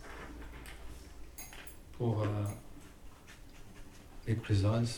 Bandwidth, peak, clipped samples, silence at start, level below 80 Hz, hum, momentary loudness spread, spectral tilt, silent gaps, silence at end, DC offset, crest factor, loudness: over 20 kHz; -20 dBFS; under 0.1%; 0 s; -52 dBFS; none; 23 LU; -6.5 dB/octave; none; 0 s; under 0.1%; 18 dB; -37 LUFS